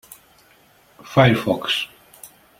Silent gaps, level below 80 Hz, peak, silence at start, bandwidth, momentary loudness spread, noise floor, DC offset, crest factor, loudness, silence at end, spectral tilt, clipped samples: none; -52 dBFS; -2 dBFS; 1.05 s; 16.5 kHz; 8 LU; -54 dBFS; under 0.1%; 20 dB; -19 LUFS; 0.35 s; -5.5 dB/octave; under 0.1%